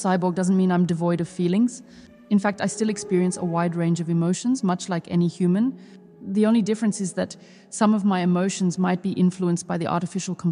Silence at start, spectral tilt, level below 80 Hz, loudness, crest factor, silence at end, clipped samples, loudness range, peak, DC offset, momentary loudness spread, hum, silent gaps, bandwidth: 0 s; -6.5 dB/octave; -66 dBFS; -23 LUFS; 16 dB; 0 s; under 0.1%; 1 LU; -8 dBFS; under 0.1%; 7 LU; none; none; 11 kHz